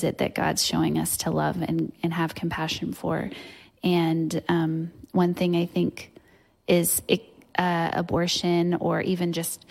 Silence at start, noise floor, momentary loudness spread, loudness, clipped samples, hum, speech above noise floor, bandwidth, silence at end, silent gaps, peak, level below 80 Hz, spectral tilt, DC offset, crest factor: 0 s; -59 dBFS; 7 LU; -25 LUFS; under 0.1%; none; 34 dB; 16.5 kHz; 0.15 s; none; -6 dBFS; -56 dBFS; -4.5 dB/octave; under 0.1%; 20 dB